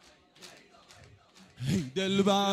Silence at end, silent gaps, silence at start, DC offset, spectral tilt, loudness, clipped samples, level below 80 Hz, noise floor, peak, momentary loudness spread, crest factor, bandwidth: 0 s; none; 0.4 s; under 0.1%; -5 dB/octave; -29 LUFS; under 0.1%; -64 dBFS; -58 dBFS; -12 dBFS; 25 LU; 20 dB; 13.5 kHz